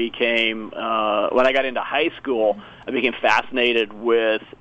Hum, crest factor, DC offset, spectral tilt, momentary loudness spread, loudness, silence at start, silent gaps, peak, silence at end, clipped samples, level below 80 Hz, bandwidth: none; 16 dB; under 0.1%; -4 dB/octave; 5 LU; -20 LUFS; 0 s; none; -4 dBFS; 0.15 s; under 0.1%; -56 dBFS; 8.2 kHz